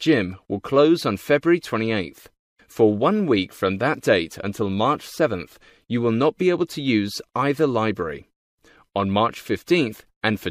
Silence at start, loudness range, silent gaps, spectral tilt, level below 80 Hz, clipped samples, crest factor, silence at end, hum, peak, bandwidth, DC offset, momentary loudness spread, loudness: 0 s; 3 LU; 2.39-2.56 s, 8.36-8.58 s, 10.16-10.21 s; -6 dB/octave; -58 dBFS; under 0.1%; 18 dB; 0 s; none; -4 dBFS; 15.5 kHz; under 0.1%; 10 LU; -22 LUFS